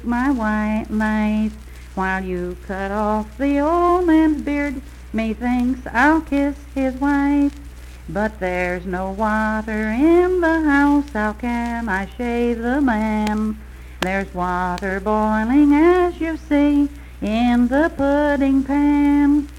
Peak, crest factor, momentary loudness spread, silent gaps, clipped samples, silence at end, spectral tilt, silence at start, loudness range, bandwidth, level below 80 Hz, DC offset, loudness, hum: -2 dBFS; 16 dB; 11 LU; none; under 0.1%; 0 s; -7 dB/octave; 0 s; 4 LU; 13 kHz; -34 dBFS; under 0.1%; -19 LUFS; none